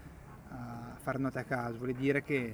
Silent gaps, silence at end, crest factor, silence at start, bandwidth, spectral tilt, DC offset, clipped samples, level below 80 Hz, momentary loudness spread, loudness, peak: none; 0 s; 20 dB; 0 s; over 20 kHz; -7.5 dB/octave; under 0.1%; under 0.1%; -58 dBFS; 16 LU; -35 LUFS; -16 dBFS